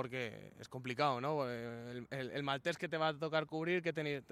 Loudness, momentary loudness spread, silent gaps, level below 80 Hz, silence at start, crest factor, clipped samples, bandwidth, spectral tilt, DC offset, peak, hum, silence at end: -39 LUFS; 10 LU; none; -76 dBFS; 0 s; 18 dB; under 0.1%; 14 kHz; -5.5 dB/octave; under 0.1%; -20 dBFS; none; 0.1 s